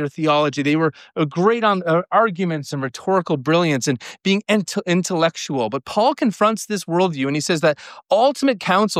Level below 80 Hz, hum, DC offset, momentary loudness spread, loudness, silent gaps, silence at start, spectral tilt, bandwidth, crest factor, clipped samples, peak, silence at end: -68 dBFS; none; under 0.1%; 6 LU; -19 LUFS; none; 0 s; -5 dB/octave; 15.5 kHz; 14 dB; under 0.1%; -4 dBFS; 0 s